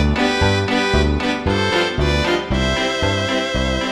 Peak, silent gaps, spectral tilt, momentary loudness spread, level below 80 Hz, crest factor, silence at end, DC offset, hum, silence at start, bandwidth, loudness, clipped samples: -4 dBFS; none; -5 dB/octave; 3 LU; -26 dBFS; 14 dB; 0 s; under 0.1%; none; 0 s; 12 kHz; -18 LUFS; under 0.1%